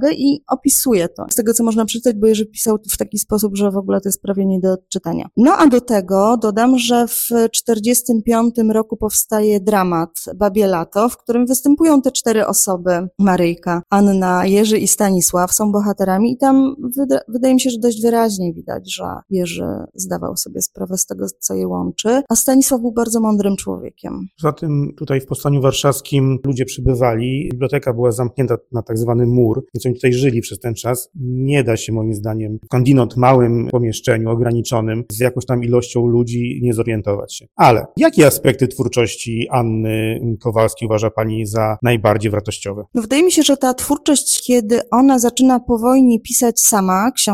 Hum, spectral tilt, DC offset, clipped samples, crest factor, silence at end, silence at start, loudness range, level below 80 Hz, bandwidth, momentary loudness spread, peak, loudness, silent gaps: none; -5 dB/octave; under 0.1%; under 0.1%; 16 dB; 0 s; 0 s; 4 LU; -42 dBFS; 16.5 kHz; 9 LU; 0 dBFS; -16 LUFS; none